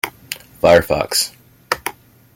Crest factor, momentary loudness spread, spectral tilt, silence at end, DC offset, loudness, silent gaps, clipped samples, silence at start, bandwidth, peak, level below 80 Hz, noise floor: 18 dB; 17 LU; -3 dB/octave; 0.45 s; under 0.1%; -17 LUFS; none; under 0.1%; 0.05 s; 17 kHz; 0 dBFS; -44 dBFS; -34 dBFS